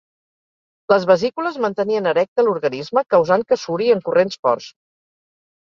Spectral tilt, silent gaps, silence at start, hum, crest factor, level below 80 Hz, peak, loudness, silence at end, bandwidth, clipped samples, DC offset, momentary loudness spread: -5.5 dB/octave; 2.28-2.36 s, 4.39-4.43 s; 0.9 s; none; 18 dB; -64 dBFS; -2 dBFS; -18 LUFS; 0.9 s; 7.4 kHz; under 0.1%; under 0.1%; 6 LU